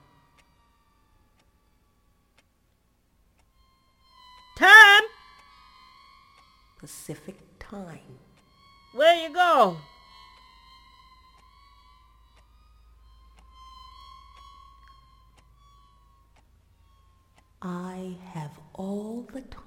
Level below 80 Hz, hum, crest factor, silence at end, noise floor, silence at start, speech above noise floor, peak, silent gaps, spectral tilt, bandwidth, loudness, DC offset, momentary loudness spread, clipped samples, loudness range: -60 dBFS; none; 26 dB; 0.25 s; -67 dBFS; 4.6 s; 41 dB; 0 dBFS; none; -2.5 dB/octave; 17 kHz; -17 LUFS; under 0.1%; 31 LU; under 0.1%; 24 LU